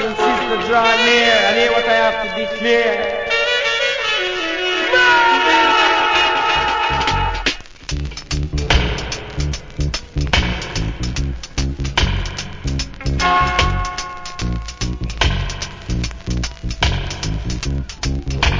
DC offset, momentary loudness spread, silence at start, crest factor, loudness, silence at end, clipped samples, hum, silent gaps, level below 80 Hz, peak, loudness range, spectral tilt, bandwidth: under 0.1%; 13 LU; 0 s; 16 dB; -17 LUFS; 0 s; under 0.1%; none; none; -26 dBFS; -2 dBFS; 8 LU; -4 dB/octave; 7.6 kHz